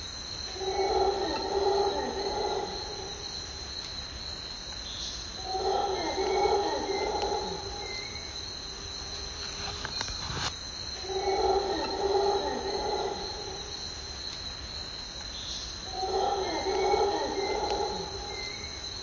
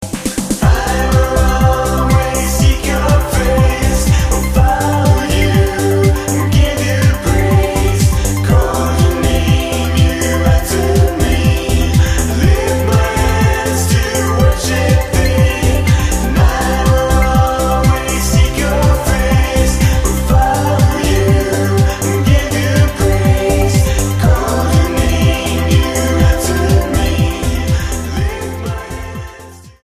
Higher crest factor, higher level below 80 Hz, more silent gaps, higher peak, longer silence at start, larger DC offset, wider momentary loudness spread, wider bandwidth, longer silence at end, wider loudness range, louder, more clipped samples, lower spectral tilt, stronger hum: first, 18 dB vs 12 dB; second, -48 dBFS vs -16 dBFS; neither; second, -14 dBFS vs 0 dBFS; about the same, 0 s vs 0 s; neither; first, 9 LU vs 3 LU; second, 7.6 kHz vs 15.5 kHz; second, 0 s vs 0.15 s; first, 4 LU vs 1 LU; second, -31 LUFS vs -13 LUFS; neither; second, -3 dB/octave vs -5.5 dB/octave; neither